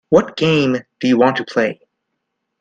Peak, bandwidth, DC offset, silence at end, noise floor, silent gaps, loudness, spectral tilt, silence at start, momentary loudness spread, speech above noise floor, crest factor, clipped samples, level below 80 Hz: 0 dBFS; 9 kHz; under 0.1%; 0.9 s; -75 dBFS; none; -16 LUFS; -6 dB/octave; 0.1 s; 6 LU; 59 dB; 16 dB; under 0.1%; -54 dBFS